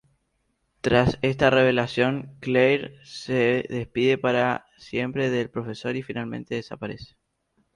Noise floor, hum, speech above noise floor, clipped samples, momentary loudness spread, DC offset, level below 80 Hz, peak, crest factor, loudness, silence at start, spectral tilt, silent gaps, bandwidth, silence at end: -73 dBFS; none; 49 dB; under 0.1%; 12 LU; under 0.1%; -52 dBFS; -4 dBFS; 20 dB; -24 LUFS; 0.85 s; -6.5 dB/octave; none; 11 kHz; 0.7 s